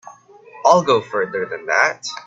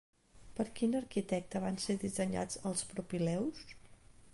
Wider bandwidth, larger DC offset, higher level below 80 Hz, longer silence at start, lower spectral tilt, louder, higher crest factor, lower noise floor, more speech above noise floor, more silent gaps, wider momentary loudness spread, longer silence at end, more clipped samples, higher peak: second, 8.2 kHz vs 11.5 kHz; neither; about the same, -66 dBFS vs -62 dBFS; second, 0.05 s vs 0.35 s; second, -3.5 dB/octave vs -5 dB/octave; first, -17 LUFS vs -37 LUFS; about the same, 18 dB vs 16 dB; second, -43 dBFS vs -58 dBFS; first, 26 dB vs 22 dB; neither; first, 9 LU vs 6 LU; about the same, 0.05 s vs 0 s; neither; first, 0 dBFS vs -22 dBFS